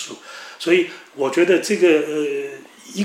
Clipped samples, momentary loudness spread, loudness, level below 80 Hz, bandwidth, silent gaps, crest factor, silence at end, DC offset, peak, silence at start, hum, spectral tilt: under 0.1%; 18 LU; -19 LUFS; -78 dBFS; 14.5 kHz; none; 16 dB; 0 s; under 0.1%; -4 dBFS; 0 s; none; -4.5 dB/octave